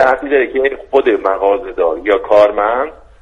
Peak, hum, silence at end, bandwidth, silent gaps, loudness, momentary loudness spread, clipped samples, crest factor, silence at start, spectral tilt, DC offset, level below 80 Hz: 0 dBFS; none; 0.3 s; 7.4 kHz; none; -13 LUFS; 7 LU; under 0.1%; 14 dB; 0 s; -5.5 dB/octave; under 0.1%; -42 dBFS